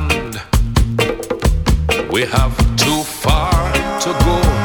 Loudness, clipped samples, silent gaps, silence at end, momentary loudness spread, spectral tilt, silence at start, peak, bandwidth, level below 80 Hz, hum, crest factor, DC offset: -16 LUFS; under 0.1%; none; 0 s; 5 LU; -4.5 dB/octave; 0 s; 0 dBFS; 19 kHz; -18 dBFS; none; 14 dB; under 0.1%